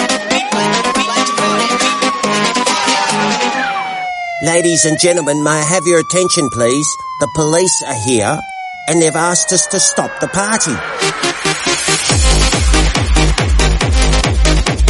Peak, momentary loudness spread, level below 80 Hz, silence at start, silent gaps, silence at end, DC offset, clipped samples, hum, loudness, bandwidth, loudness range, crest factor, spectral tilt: 0 dBFS; 6 LU; -20 dBFS; 0 s; none; 0 s; under 0.1%; under 0.1%; none; -13 LUFS; 11.5 kHz; 1 LU; 14 dB; -3 dB/octave